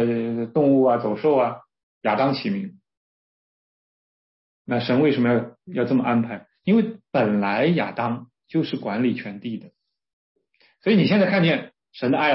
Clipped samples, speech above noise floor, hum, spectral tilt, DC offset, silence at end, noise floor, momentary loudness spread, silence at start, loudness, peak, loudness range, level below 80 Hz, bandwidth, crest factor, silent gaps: under 0.1%; over 69 dB; none; -11 dB/octave; under 0.1%; 0 s; under -90 dBFS; 13 LU; 0 s; -22 LUFS; -8 dBFS; 5 LU; -68 dBFS; 5.8 kHz; 16 dB; 1.83-2.01 s, 2.97-4.65 s, 10.13-10.35 s